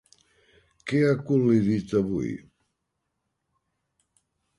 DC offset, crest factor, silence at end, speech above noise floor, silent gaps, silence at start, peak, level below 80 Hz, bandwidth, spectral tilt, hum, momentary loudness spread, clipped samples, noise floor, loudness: under 0.1%; 18 dB; 2.2 s; 57 dB; none; 0.85 s; -10 dBFS; -58 dBFS; 11.5 kHz; -8 dB/octave; none; 14 LU; under 0.1%; -80 dBFS; -24 LUFS